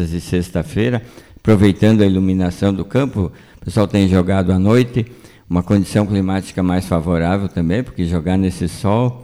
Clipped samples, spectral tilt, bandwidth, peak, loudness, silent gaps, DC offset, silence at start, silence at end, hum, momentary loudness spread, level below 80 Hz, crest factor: under 0.1%; -7.5 dB/octave; 13.5 kHz; -2 dBFS; -17 LUFS; none; under 0.1%; 0 s; 0 s; none; 8 LU; -38 dBFS; 14 dB